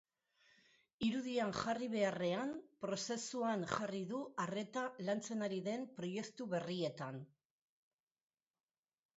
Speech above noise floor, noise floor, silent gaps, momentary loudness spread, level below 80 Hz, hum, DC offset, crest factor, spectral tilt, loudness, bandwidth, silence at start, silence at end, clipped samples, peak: 34 dB; -75 dBFS; none; 7 LU; -78 dBFS; none; under 0.1%; 20 dB; -4.5 dB/octave; -41 LUFS; 8 kHz; 1 s; 1.9 s; under 0.1%; -22 dBFS